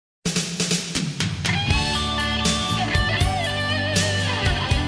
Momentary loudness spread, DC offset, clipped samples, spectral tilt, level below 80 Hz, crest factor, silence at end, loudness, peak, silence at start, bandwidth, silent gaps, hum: 3 LU; under 0.1%; under 0.1%; -3.5 dB/octave; -32 dBFS; 16 dB; 0 s; -22 LUFS; -6 dBFS; 0.25 s; 11 kHz; none; none